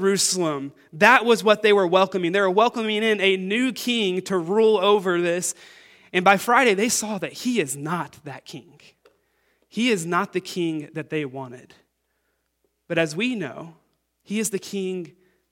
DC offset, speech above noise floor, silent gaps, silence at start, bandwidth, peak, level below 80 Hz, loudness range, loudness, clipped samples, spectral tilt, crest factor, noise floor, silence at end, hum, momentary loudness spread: under 0.1%; 51 dB; none; 0 s; 17 kHz; 0 dBFS; -72 dBFS; 10 LU; -21 LUFS; under 0.1%; -3.5 dB/octave; 22 dB; -73 dBFS; 0.45 s; none; 17 LU